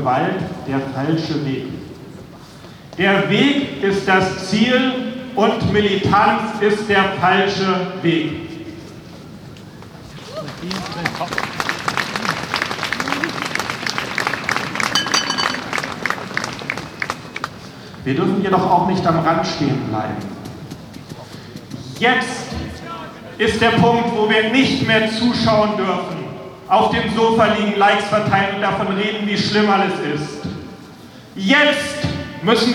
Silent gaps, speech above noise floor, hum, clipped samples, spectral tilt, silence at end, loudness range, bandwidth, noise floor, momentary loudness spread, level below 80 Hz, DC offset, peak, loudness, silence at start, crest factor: none; 22 dB; none; under 0.1%; -5 dB/octave; 0 s; 7 LU; 19.5 kHz; -39 dBFS; 20 LU; -50 dBFS; under 0.1%; 0 dBFS; -18 LUFS; 0 s; 18 dB